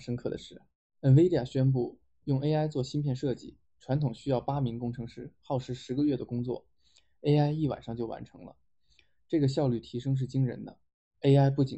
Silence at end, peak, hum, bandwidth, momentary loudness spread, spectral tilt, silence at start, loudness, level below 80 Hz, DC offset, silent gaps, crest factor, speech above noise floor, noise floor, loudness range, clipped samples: 0 s; -12 dBFS; none; 8.2 kHz; 17 LU; -8.5 dB/octave; 0 s; -30 LUFS; -58 dBFS; under 0.1%; 0.75-0.90 s, 10.94-11.11 s; 18 dB; 40 dB; -69 dBFS; 5 LU; under 0.1%